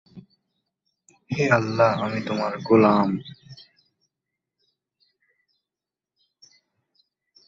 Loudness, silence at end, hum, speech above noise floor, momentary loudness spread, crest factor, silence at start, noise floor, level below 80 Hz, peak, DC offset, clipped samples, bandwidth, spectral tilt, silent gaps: -21 LUFS; 3.95 s; none; 69 dB; 14 LU; 22 dB; 0.15 s; -89 dBFS; -62 dBFS; -4 dBFS; under 0.1%; under 0.1%; 7.6 kHz; -7 dB/octave; none